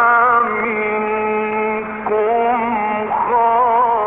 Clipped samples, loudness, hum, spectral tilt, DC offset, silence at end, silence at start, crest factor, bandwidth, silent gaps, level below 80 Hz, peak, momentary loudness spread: under 0.1%; -16 LUFS; none; -3.5 dB/octave; 0.1%; 0 s; 0 s; 10 dB; 3.9 kHz; none; -54 dBFS; -6 dBFS; 6 LU